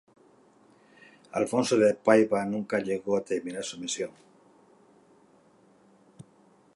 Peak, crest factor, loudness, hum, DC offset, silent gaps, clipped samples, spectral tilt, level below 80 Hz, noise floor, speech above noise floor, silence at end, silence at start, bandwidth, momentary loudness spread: -6 dBFS; 24 dB; -27 LUFS; none; under 0.1%; none; under 0.1%; -4.5 dB/octave; -72 dBFS; -61 dBFS; 34 dB; 0.55 s; 1.35 s; 11.5 kHz; 13 LU